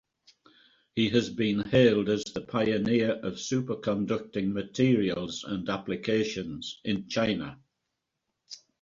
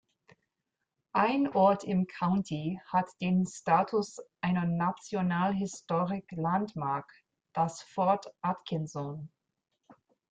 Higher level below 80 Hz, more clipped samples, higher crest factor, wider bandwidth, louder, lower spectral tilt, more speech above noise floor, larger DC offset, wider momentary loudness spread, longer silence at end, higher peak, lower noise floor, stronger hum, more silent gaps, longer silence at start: first, -60 dBFS vs -70 dBFS; neither; about the same, 20 dB vs 18 dB; second, 7.8 kHz vs 9 kHz; first, -28 LUFS vs -31 LUFS; second, -5.5 dB/octave vs -7 dB/octave; about the same, 55 dB vs 56 dB; neither; about the same, 11 LU vs 9 LU; about the same, 0.25 s vs 0.35 s; about the same, -10 dBFS vs -12 dBFS; about the same, -83 dBFS vs -86 dBFS; neither; neither; second, 0.95 s vs 1.15 s